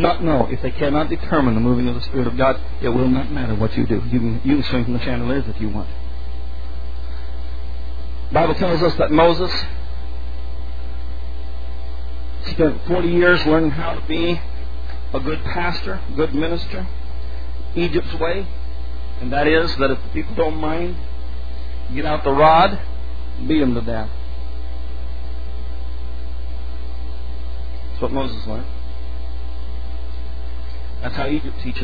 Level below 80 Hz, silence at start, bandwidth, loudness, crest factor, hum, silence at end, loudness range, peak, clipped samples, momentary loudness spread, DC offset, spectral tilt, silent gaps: -28 dBFS; 0 s; 5 kHz; -22 LUFS; 20 dB; none; 0 s; 10 LU; 0 dBFS; under 0.1%; 15 LU; 10%; -8.5 dB/octave; none